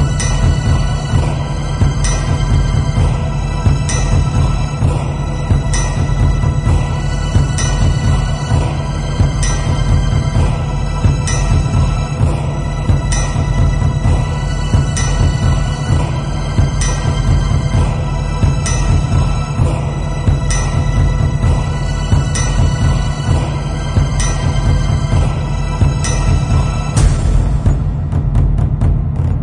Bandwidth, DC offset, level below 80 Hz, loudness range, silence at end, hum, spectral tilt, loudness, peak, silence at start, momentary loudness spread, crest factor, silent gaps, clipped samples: 11 kHz; under 0.1%; -18 dBFS; 1 LU; 0 s; none; -6 dB/octave; -15 LUFS; 0 dBFS; 0 s; 4 LU; 14 dB; none; under 0.1%